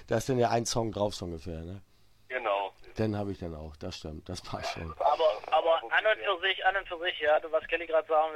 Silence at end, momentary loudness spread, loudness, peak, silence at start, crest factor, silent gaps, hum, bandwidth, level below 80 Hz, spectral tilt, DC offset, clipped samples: 0 s; 14 LU; -30 LUFS; -12 dBFS; 0 s; 18 dB; none; none; 14 kHz; -54 dBFS; -4 dB/octave; under 0.1%; under 0.1%